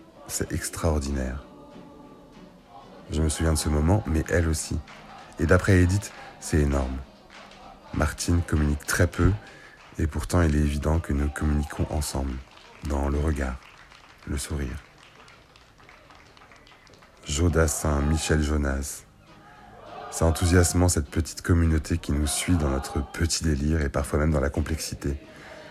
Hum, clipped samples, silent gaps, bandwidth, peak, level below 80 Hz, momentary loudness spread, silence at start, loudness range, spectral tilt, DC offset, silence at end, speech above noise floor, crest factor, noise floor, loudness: none; under 0.1%; none; 14 kHz; -6 dBFS; -32 dBFS; 20 LU; 0.15 s; 8 LU; -5.5 dB/octave; under 0.1%; 0 s; 29 dB; 20 dB; -53 dBFS; -26 LUFS